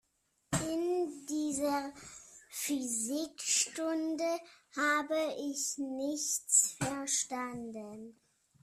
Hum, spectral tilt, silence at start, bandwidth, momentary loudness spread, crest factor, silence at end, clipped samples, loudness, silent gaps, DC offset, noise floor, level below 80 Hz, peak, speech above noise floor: none; -2.5 dB/octave; 0.5 s; 15.5 kHz; 15 LU; 20 dB; 0.5 s; under 0.1%; -33 LUFS; none; under 0.1%; -77 dBFS; -68 dBFS; -14 dBFS; 42 dB